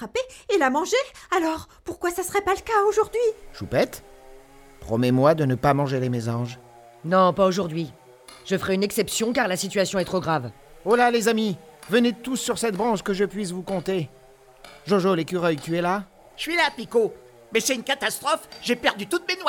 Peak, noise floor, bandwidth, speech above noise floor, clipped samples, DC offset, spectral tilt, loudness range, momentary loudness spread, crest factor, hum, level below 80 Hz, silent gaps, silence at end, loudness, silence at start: -6 dBFS; -49 dBFS; 18 kHz; 26 dB; under 0.1%; under 0.1%; -4.5 dB/octave; 3 LU; 11 LU; 18 dB; none; -54 dBFS; none; 0 s; -23 LUFS; 0 s